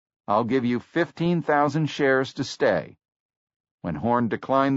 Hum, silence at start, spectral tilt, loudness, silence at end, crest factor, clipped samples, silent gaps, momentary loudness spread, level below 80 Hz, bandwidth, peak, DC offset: none; 0.3 s; -5 dB/octave; -24 LUFS; 0 s; 16 dB; under 0.1%; 3.12-3.29 s, 3.36-3.47 s, 3.56-3.64 s, 3.71-3.78 s; 7 LU; -60 dBFS; 8 kHz; -8 dBFS; under 0.1%